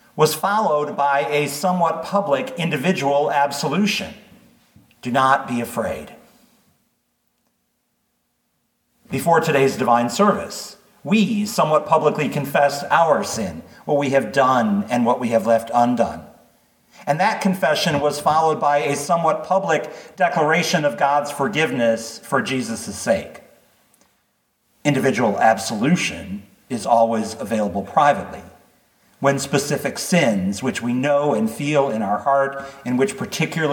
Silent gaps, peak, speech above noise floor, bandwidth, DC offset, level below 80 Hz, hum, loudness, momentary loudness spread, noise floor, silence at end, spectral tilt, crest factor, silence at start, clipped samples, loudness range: none; -2 dBFS; 51 dB; 19 kHz; under 0.1%; -60 dBFS; none; -19 LUFS; 8 LU; -70 dBFS; 0 s; -5 dB/octave; 18 dB; 0.15 s; under 0.1%; 5 LU